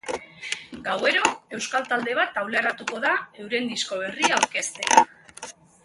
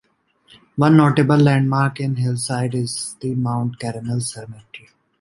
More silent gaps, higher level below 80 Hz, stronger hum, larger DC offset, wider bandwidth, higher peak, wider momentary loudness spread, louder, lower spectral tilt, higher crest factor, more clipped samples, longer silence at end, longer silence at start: neither; second, -66 dBFS vs -56 dBFS; neither; neither; about the same, 11.5 kHz vs 11.5 kHz; about the same, 0 dBFS vs -2 dBFS; about the same, 14 LU vs 14 LU; second, -24 LUFS vs -19 LUFS; second, -1 dB/octave vs -6.5 dB/octave; first, 24 dB vs 18 dB; neither; about the same, 0.35 s vs 0.4 s; second, 0.05 s vs 0.75 s